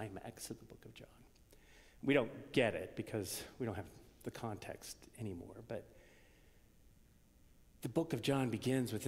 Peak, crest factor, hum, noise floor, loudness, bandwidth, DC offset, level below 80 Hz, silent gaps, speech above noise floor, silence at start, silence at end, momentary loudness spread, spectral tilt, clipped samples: -18 dBFS; 24 dB; none; -66 dBFS; -41 LUFS; 16 kHz; under 0.1%; -66 dBFS; none; 26 dB; 0 s; 0 s; 19 LU; -5.5 dB/octave; under 0.1%